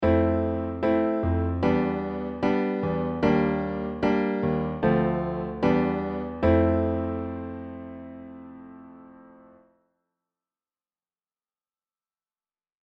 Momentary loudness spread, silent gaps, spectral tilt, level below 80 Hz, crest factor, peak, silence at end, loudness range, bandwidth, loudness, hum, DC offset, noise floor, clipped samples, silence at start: 17 LU; none; -9.5 dB/octave; -44 dBFS; 18 dB; -8 dBFS; 3.65 s; 14 LU; 6.2 kHz; -25 LUFS; none; under 0.1%; under -90 dBFS; under 0.1%; 0 s